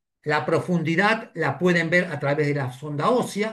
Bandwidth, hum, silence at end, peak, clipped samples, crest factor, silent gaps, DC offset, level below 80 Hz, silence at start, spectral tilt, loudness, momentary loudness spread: 12.5 kHz; none; 0 s; -6 dBFS; under 0.1%; 18 dB; none; under 0.1%; -66 dBFS; 0.25 s; -6 dB/octave; -23 LUFS; 5 LU